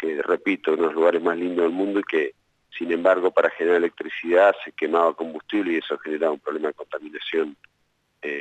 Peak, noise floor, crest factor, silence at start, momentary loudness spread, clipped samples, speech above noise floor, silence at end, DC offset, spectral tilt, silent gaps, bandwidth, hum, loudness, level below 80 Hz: -6 dBFS; -70 dBFS; 16 dB; 0 s; 12 LU; under 0.1%; 47 dB; 0 s; under 0.1%; -6 dB/octave; none; 8.2 kHz; none; -23 LUFS; -74 dBFS